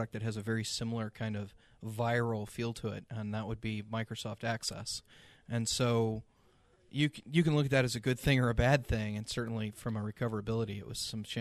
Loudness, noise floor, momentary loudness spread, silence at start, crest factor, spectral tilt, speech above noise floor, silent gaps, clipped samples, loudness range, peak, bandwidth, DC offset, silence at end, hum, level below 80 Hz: -34 LUFS; -67 dBFS; 11 LU; 0 s; 22 dB; -5.5 dB/octave; 33 dB; none; under 0.1%; 6 LU; -12 dBFS; 13.5 kHz; under 0.1%; 0 s; none; -50 dBFS